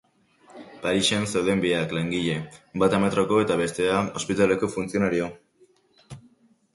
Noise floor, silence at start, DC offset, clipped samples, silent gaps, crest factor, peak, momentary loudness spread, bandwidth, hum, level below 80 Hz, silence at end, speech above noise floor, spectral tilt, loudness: -60 dBFS; 0.55 s; under 0.1%; under 0.1%; none; 18 dB; -8 dBFS; 7 LU; 11.5 kHz; none; -54 dBFS; 0.55 s; 37 dB; -5 dB/octave; -24 LUFS